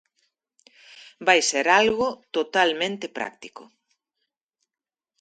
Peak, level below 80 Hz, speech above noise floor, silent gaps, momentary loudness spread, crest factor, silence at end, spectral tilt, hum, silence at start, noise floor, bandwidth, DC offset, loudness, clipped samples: -2 dBFS; -66 dBFS; over 67 dB; none; 15 LU; 24 dB; 1.6 s; -1.5 dB/octave; none; 0.95 s; under -90 dBFS; 9.4 kHz; under 0.1%; -22 LUFS; under 0.1%